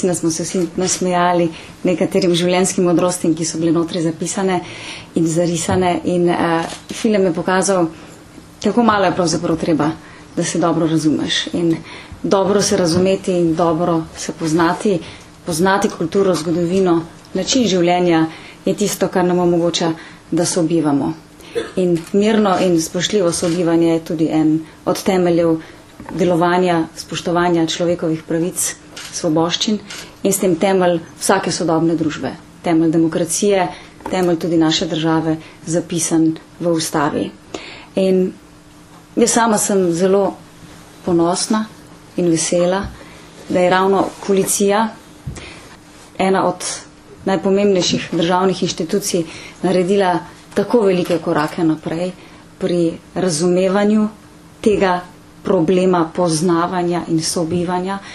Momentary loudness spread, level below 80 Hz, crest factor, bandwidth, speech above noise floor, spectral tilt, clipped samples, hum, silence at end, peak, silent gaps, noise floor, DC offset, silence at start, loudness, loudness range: 9 LU; -48 dBFS; 16 dB; 13.5 kHz; 26 dB; -4.5 dB/octave; under 0.1%; none; 0 s; 0 dBFS; none; -42 dBFS; under 0.1%; 0 s; -17 LUFS; 2 LU